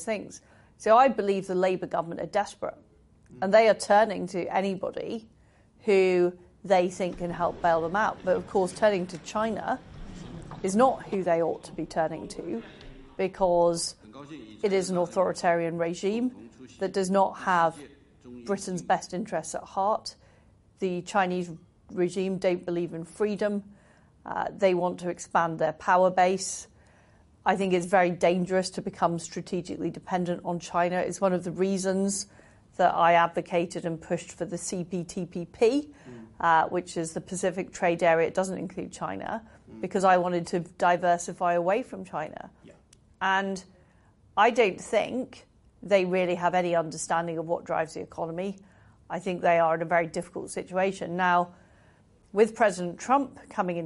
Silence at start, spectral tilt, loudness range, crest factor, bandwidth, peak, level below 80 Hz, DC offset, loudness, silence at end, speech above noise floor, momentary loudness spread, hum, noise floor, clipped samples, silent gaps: 0 s; -5 dB/octave; 4 LU; 18 dB; 11.5 kHz; -8 dBFS; -60 dBFS; under 0.1%; -27 LUFS; 0 s; 33 dB; 13 LU; none; -60 dBFS; under 0.1%; none